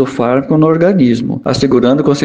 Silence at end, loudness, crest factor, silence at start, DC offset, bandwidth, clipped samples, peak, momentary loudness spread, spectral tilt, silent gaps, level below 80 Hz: 0 s; -11 LUFS; 10 dB; 0 s; under 0.1%; 9.4 kHz; under 0.1%; 0 dBFS; 5 LU; -7 dB/octave; none; -42 dBFS